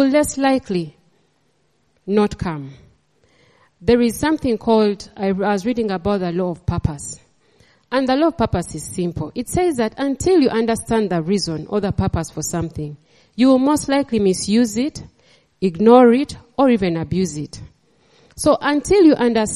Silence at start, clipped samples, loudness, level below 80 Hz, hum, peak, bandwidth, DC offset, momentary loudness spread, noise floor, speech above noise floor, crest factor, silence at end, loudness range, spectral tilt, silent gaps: 0 s; under 0.1%; -18 LUFS; -42 dBFS; none; 0 dBFS; 13.5 kHz; under 0.1%; 13 LU; -64 dBFS; 46 dB; 18 dB; 0 s; 6 LU; -5.5 dB/octave; none